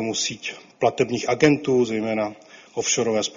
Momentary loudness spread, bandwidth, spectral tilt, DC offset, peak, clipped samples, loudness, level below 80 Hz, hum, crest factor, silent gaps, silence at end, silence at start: 12 LU; 7.6 kHz; -4 dB/octave; under 0.1%; -2 dBFS; under 0.1%; -22 LUFS; -60 dBFS; none; 20 dB; none; 0 s; 0 s